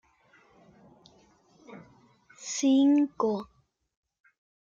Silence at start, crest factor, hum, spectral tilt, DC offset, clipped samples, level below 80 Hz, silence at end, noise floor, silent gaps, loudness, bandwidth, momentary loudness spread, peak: 1.7 s; 16 dB; none; -4 dB/octave; under 0.1%; under 0.1%; -74 dBFS; 1.2 s; -63 dBFS; none; -26 LUFS; 7.6 kHz; 28 LU; -14 dBFS